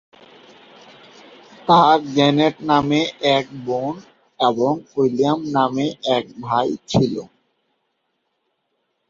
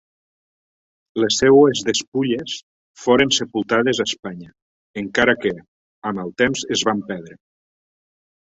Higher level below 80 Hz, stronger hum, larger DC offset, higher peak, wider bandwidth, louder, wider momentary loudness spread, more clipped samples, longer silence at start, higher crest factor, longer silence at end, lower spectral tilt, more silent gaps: about the same, -56 dBFS vs -56 dBFS; neither; neither; about the same, -2 dBFS vs -2 dBFS; about the same, 7.6 kHz vs 8 kHz; about the same, -19 LUFS vs -18 LUFS; second, 9 LU vs 18 LU; neither; first, 1.65 s vs 1.15 s; about the same, 18 dB vs 18 dB; first, 1.85 s vs 1.15 s; first, -6 dB/octave vs -3.5 dB/octave; second, none vs 2.08-2.12 s, 2.63-2.95 s, 4.62-4.94 s, 5.68-6.02 s